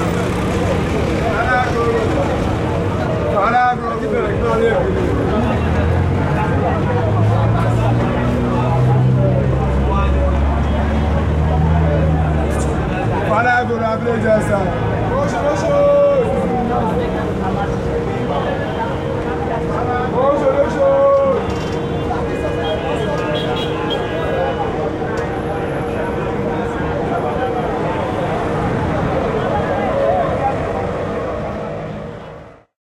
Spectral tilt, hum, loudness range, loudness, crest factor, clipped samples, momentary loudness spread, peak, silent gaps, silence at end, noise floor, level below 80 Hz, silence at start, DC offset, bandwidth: -7.5 dB/octave; none; 4 LU; -17 LUFS; 12 dB; under 0.1%; 6 LU; -4 dBFS; none; 0.25 s; -37 dBFS; -28 dBFS; 0 s; under 0.1%; 12 kHz